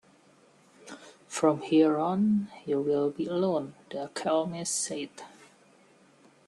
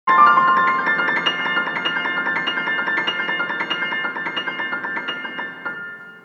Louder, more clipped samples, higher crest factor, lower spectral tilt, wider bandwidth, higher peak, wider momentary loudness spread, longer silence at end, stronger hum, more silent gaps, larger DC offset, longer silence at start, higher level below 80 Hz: second, -28 LUFS vs -19 LUFS; neither; about the same, 20 dB vs 18 dB; first, -5 dB/octave vs -3.5 dB/octave; first, 12.5 kHz vs 7.4 kHz; second, -10 dBFS vs -2 dBFS; first, 23 LU vs 14 LU; first, 1.2 s vs 0.05 s; neither; neither; neither; first, 0.85 s vs 0.05 s; first, -74 dBFS vs -86 dBFS